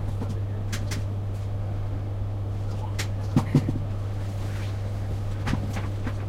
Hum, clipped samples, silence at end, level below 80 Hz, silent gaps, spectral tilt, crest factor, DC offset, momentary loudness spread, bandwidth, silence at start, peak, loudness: none; under 0.1%; 0 s; -36 dBFS; none; -7 dB/octave; 20 dB; under 0.1%; 6 LU; 14 kHz; 0 s; -6 dBFS; -29 LUFS